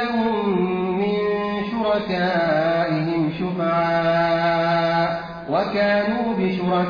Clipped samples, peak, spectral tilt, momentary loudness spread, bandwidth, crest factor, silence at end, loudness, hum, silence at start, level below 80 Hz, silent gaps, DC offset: under 0.1%; -10 dBFS; -8 dB/octave; 4 LU; 5.2 kHz; 12 dB; 0 s; -21 LUFS; none; 0 s; -52 dBFS; none; under 0.1%